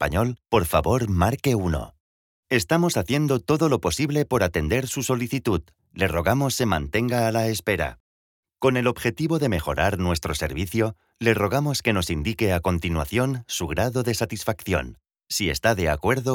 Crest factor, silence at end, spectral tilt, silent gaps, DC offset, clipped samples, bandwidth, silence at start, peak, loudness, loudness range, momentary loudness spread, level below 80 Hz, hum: 16 dB; 0 s; -5 dB/octave; 2.00-2.43 s, 8.00-8.43 s; under 0.1%; under 0.1%; 18 kHz; 0 s; -6 dBFS; -23 LUFS; 2 LU; 5 LU; -40 dBFS; none